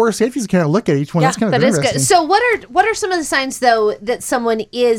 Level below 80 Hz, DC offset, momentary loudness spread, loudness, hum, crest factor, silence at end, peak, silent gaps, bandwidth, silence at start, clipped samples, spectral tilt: -50 dBFS; under 0.1%; 6 LU; -15 LUFS; none; 14 dB; 0 s; 0 dBFS; none; 17 kHz; 0 s; under 0.1%; -4.5 dB/octave